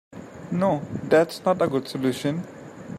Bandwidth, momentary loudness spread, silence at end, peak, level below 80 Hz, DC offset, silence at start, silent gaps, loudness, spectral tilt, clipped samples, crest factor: 16 kHz; 19 LU; 0 s; -6 dBFS; -62 dBFS; under 0.1%; 0.1 s; none; -24 LUFS; -6.5 dB/octave; under 0.1%; 20 dB